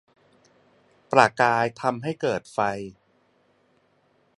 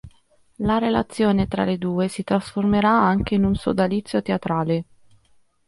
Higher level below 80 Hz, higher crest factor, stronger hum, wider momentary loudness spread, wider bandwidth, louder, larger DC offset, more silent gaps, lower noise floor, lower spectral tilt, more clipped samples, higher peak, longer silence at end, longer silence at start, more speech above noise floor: second, -66 dBFS vs -42 dBFS; first, 26 dB vs 16 dB; neither; first, 9 LU vs 6 LU; about the same, 11.5 kHz vs 11.5 kHz; about the same, -23 LUFS vs -21 LUFS; neither; neither; first, -65 dBFS vs -59 dBFS; second, -5 dB/octave vs -7 dB/octave; neither; first, 0 dBFS vs -6 dBFS; first, 1.5 s vs 0.85 s; first, 1.1 s vs 0.05 s; about the same, 42 dB vs 39 dB